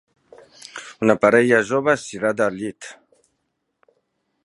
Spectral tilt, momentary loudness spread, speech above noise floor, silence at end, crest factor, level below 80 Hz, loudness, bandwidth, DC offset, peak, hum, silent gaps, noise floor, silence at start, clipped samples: -5.5 dB/octave; 22 LU; 56 dB; 1.55 s; 22 dB; -64 dBFS; -19 LUFS; 11.5 kHz; under 0.1%; 0 dBFS; none; none; -74 dBFS; 0.75 s; under 0.1%